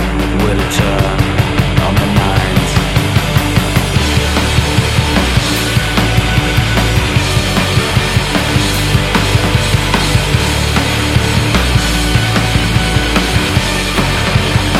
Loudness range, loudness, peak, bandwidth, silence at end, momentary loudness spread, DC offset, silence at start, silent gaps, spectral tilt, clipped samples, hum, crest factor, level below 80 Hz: 0 LU; -12 LUFS; 0 dBFS; 16.5 kHz; 0 s; 1 LU; under 0.1%; 0 s; none; -4.5 dB/octave; under 0.1%; none; 12 dB; -20 dBFS